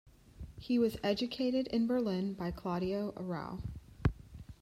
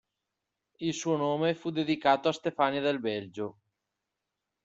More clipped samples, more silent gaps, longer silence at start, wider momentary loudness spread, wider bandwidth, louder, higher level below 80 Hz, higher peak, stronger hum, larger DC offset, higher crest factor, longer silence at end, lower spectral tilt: neither; neither; second, 0.05 s vs 0.8 s; first, 17 LU vs 10 LU; first, 14.5 kHz vs 8 kHz; second, -35 LUFS vs -30 LUFS; first, -52 dBFS vs -74 dBFS; second, -16 dBFS vs -10 dBFS; neither; neither; about the same, 18 dB vs 22 dB; second, 0.1 s vs 1.15 s; first, -7.5 dB/octave vs -5 dB/octave